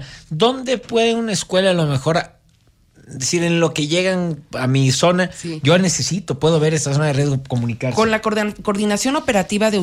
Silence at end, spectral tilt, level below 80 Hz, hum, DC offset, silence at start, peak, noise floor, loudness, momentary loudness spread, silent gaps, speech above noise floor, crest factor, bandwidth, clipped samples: 0 s; -4.5 dB/octave; -48 dBFS; none; under 0.1%; 0 s; -4 dBFS; -55 dBFS; -18 LUFS; 7 LU; none; 38 dB; 14 dB; 15.5 kHz; under 0.1%